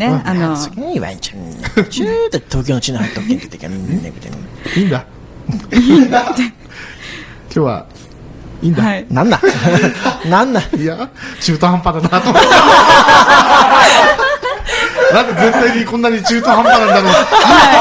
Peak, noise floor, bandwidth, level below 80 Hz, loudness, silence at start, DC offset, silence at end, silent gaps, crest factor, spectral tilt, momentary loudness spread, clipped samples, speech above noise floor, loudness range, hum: 0 dBFS; -33 dBFS; 8 kHz; -36 dBFS; -11 LUFS; 0 s; under 0.1%; 0 s; none; 12 dB; -4.5 dB/octave; 19 LU; 0.8%; 23 dB; 11 LU; none